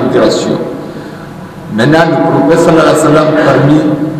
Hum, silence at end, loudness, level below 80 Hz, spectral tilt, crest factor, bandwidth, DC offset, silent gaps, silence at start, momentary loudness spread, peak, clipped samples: none; 0 s; -8 LUFS; -40 dBFS; -6 dB/octave; 8 dB; 14 kHz; under 0.1%; none; 0 s; 18 LU; 0 dBFS; under 0.1%